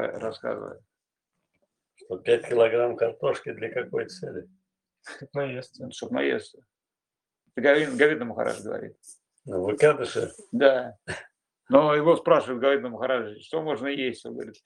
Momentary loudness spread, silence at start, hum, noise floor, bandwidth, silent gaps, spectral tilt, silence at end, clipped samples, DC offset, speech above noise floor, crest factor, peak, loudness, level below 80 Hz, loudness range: 17 LU; 0 s; none; -90 dBFS; 11 kHz; none; -5.5 dB/octave; 0.15 s; under 0.1%; under 0.1%; 65 dB; 24 dB; -2 dBFS; -25 LUFS; -72 dBFS; 9 LU